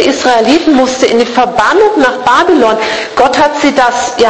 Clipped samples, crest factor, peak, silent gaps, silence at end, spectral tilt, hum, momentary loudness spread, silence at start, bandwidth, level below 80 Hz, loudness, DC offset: 0.9%; 8 dB; 0 dBFS; none; 0 s; -3 dB/octave; none; 3 LU; 0 s; 11 kHz; -42 dBFS; -8 LUFS; 0.2%